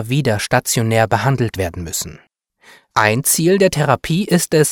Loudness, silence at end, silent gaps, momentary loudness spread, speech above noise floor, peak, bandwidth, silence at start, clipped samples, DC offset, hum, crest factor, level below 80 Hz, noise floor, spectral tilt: -16 LUFS; 0 s; none; 10 LU; 34 dB; 0 dBFS; 18.5 kHz; 0 s; under 0.1%; under 0.1%; none; 16 dB; -44 dBFS; -50 dBFS; -4.5 dB/octave